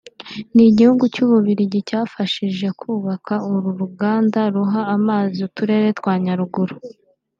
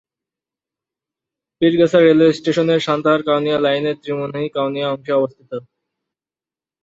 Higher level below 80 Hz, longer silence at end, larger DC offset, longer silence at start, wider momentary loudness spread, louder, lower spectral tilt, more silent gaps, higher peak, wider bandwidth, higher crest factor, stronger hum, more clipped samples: about the same, -60 dBFS vs -62 dBFS; second, 0.5 s vs 1.25 s; neither; second, 0.2 s vs 1.6 s; about the same, 11 LU vs 12 LU; about the same, -18 LUFS vs -17 LUFS; first, -8 dB/octave vs -6.5 dB/octave; neither; about the same, -2 dBFS vs -2 dBFS; about the same, 7.2 kHz vs 7.8 kHz; about the same, 16 dB vs 16 dB; neither; neither